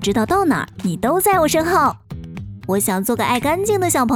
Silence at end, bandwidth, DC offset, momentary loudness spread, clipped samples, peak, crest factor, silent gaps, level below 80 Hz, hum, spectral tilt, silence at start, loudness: 0 s; over 20 kHz; under 0.1%; 16 LU; under 0.1%; -4 dBFS; 14 dB; none; -42 dBFS; none; -4.5 dB/octave; 0 s; -17 LUFS